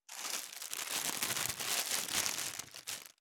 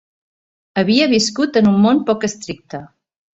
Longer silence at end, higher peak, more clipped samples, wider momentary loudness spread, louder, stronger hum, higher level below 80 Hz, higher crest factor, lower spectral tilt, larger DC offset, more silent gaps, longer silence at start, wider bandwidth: second, 0.15 s vs 0.5 s; second, -12 dBFS vs -2 dBFS; neither; second, 10 LU vs 17 LU; second, -36 LUFS vs -15 LUFS; neither; second, -74 dBFS vs -56 dBFS; first, 28 dB vs 14 dB; second, 0.5 dB/octave vs -5 dB/octave; neither; neither; second, 0.1 s vs 0.75 s; first, over 20 kHz vs 8.2 kHz